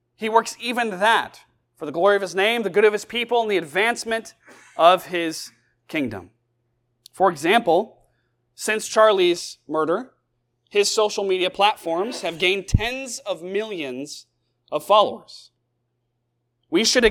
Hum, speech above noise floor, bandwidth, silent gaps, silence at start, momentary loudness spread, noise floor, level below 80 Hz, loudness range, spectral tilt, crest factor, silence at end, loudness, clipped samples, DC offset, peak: none; 53 dB; 17.5 kHz; none; 0.2 s; 13 LU; -74 dBFS; -44 dBFS; 4 LU; -3.5 dB/octave; 22 dB; 0 s; -21 LUFS; under 0.1%; under 0.1%; 0 dBFS